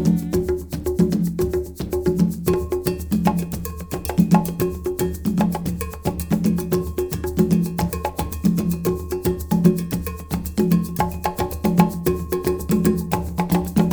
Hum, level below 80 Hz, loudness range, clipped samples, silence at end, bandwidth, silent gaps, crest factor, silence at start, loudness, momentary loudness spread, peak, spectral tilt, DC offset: none; -34 dBFS; 1 LU; under 0.1%; 0 s; over 20 kHz; none; 20 dB; 0 s; -22 LUFS; 8 LU; 0 dBFS; -7 dB/octave; 0.1%